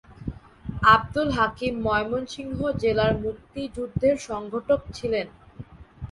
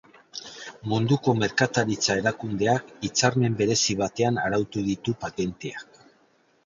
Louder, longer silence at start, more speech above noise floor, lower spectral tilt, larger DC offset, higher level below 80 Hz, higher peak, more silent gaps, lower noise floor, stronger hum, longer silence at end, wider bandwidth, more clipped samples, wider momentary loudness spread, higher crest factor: about the same, -24 LUFS vs -24 LUFS; second, 0.1 s vs 0.35 s; second, 20 dB vs 38 dB; first, -6 dB/octave vs -4.5 dB/octave; neither; first, -44 dBFS vs -56 dBFS; about the same, -4 dBFS vs -6 dBFS; neither; second, -44 dBFS vs -63 dBFS; neither; second, 0 s vs 0.8 s; first, 11.5 kHz vs 7.8 kHz; neither; first, 19 LU vs 14 LU; about the same, 22 dB vs 20 dB